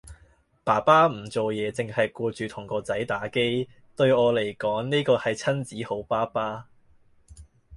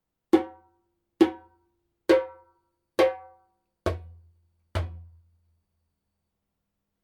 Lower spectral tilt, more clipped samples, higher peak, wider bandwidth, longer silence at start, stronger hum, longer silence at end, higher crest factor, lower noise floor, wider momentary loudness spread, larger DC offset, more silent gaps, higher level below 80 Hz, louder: about the same, -5.5 dB/octave vs -6.5 dB/octave; neither; about the same, -6 dBFS vs -6 dBFS; second, 11.5 kHz vs 14.5 kHz; second, 0.05 s vs 0.35 s; neither; second, 0 s vs 2 s; about the same, 20 dB vs 24 dB; second, -59 dBFS vs -81 dBFS; second, 13 LU vs 17 LU; neither; neither; second, -58 dBFS vs -52 dBFS; about the same, -25 LUFS vs -27 LUFS